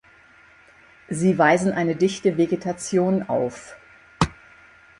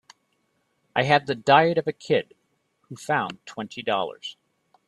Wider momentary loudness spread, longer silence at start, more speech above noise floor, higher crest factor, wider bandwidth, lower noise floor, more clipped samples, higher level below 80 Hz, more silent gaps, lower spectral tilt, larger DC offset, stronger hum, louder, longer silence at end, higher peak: second, 11 LU vs 20 LU; first, 1.1 s vs 0.95 s; second, 31 dB vs 48 dB; about the same, 22 dB vs 22 dB; about the same, 11.5 kHz vs 12.5 kHz; second, -52 dBFS vs -71 dBFS; neither; first, -50 dBFS vs -68 dBFS; neither; about the same, -6 dB/octave vs -5.5 dB/octave; neither; neither; about the same, -22 LUFS vs -23 LUFS; first, 0.7 s vs 0.55 s; about the same, -2 dBFS vs -2 dBFS